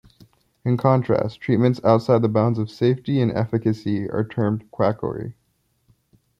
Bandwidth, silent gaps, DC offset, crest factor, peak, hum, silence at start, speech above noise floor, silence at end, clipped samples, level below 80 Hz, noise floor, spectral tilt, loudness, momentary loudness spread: 7.4 kHz; none; under 0.1%; 20 dB; -2 dBFS; none; 0.65 s; 47 dB; 1.05 s; under 0.1%; -58 dBFS; -67 dBFS; -9.5 dB/octave; -21 LUFS; 8 LU